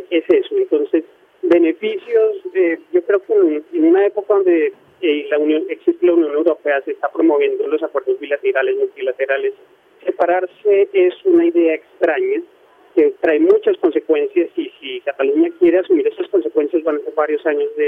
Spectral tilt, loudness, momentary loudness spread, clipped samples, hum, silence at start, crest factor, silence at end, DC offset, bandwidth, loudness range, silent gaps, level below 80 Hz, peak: -6.5 dB/octave; -17 LUFS; 7 LU; under 0.1%; none; 0 s; 14 dB; 0 s; under 0.1%; 3.8 kHz; 2 LU; none; -68 dBFS; -2 dBFS